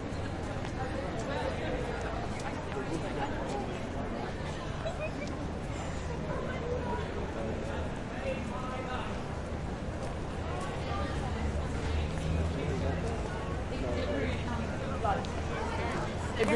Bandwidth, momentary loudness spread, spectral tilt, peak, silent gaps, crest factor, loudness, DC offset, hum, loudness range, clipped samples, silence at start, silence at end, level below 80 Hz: 11.5 kHz; 5 LU; -6 dB/octave; -14 dBFS; none; 20 dB; -35 LUFS; under 0.1%; none; 3 LU; under 0.1%; 0 s; 0 s; -42 dBFS